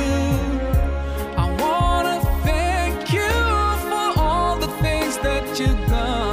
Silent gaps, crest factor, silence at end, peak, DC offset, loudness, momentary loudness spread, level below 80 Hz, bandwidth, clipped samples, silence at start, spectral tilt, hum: none; 12 dB; 0 s; -8 dBFS; under 0.1%; -21 LUFS; 4 LU; -24 dBFS; 16 kHz; under 0.1%; 0 s; -5.5 dB/octave; none